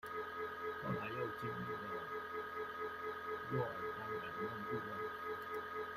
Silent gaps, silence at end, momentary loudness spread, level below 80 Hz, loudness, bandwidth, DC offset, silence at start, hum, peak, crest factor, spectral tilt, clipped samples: none; 0 s; 3 LU; -74 dBFS; -43 LUFS; 16 kHz; under 0.1%; 0.05 s; none; -26 dBFS; 16 dB; -6.5 dB/octave; under 0.1%